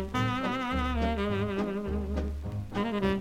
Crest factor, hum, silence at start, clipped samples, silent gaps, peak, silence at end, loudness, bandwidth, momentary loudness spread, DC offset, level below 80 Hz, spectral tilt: 16 dB; none; 0 s; under 0.1%; none; -14 dBFS; 0 s; -31 LUFS; 14.5 kHz; 5 LU; under 0.1%; -38 dBFS; -7 dB/octave